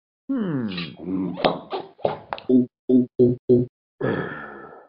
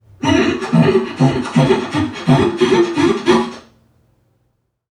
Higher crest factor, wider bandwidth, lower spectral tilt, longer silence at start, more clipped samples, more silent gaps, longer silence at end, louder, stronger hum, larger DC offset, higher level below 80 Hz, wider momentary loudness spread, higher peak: first, 20 dB vs 14 dB; second, 5.4 kHz vs 11 kHz; about the same, -6 dB/octave vs -6.5 dB/octave; about the same, 0.3 s vs 0.2 s; neither; first, 2.79-2.88 s, 3.39-3.48 s, 3.69-3.98 s vs none; second, 0.1 s vs 1.3 s; second, -23 LUFS vs -15 LUFS; neither; neither; second, -56 dBFS vs -44 dBFS; first, 12 LU vs 3 LU; about the same, -2 dBFS vs 0 dBFS